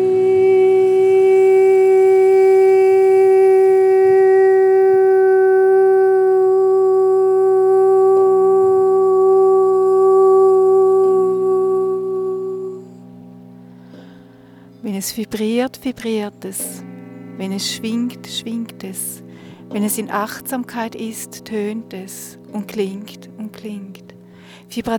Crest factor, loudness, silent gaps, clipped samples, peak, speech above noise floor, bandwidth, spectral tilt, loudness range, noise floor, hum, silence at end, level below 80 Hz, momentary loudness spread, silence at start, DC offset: 10 dB; -14 LUFS; none; under 0.1%; -4 dBFS; 19 dB; 15 kHz; -5 dB/octave; 15 LU; -43 dBFS; none; 0 s; -62 dBFS; 18 LU; 0 s; under 0.1%